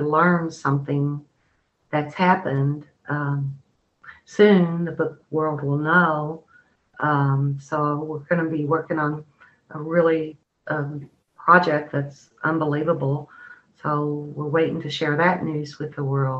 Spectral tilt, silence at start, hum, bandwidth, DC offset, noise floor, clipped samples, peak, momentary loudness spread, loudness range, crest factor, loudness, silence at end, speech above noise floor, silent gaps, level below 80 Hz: -8 dB/octave; 0 s; none; 7.8 kHz; under 0.1%; -67 dBFS; under 0.1%; -2 dBFS; 14 LU; 3 LU; 22 dB; -22 LUFS; 0 s; 45 dB; none; -64 dBFS